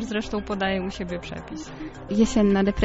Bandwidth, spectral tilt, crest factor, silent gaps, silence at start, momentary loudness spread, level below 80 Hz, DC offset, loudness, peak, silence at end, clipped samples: 8 kHz; -5.5 dB/octave; 18 dB; none; 0 s; 16 LU; -40 dBFS; under 0.1%; -25 LUFS; -6 dBFS; 0 s; under 0.1%